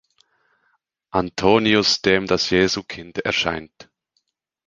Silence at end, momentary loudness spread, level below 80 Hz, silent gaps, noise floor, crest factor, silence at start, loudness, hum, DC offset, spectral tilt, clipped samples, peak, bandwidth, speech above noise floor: 1 s; 11 LU; -48 dBFS; none; -72 dBFS; 22 dB; 1.15 s; -19 LUFS; none; under 0.1%; -4 dB/octave; under 0.1%; 0 dBFS; 9.8 kHz; 52 dB